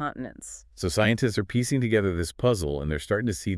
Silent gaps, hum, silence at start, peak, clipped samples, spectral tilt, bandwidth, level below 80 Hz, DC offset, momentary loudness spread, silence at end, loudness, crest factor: none; none; 0 s; -8 dBFS; under 0.1%; -5.5 dB/octave; 12 kHz; -44 dBFS; under 0.1%; 14 LU; 0 s; -26 LUFS; 18 dB